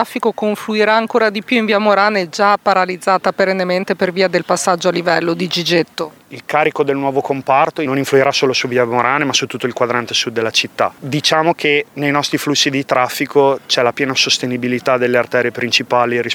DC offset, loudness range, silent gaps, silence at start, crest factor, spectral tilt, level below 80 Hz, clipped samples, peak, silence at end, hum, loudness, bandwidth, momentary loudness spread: under 0.1%; 2 LU; none; 0 s; 16 dB; -3.5 dB/octave; -64 dBFS; under 0.1%; 0 dBFS; 0 s; none; -15 LUFS; 18.5 kHz; 5 LU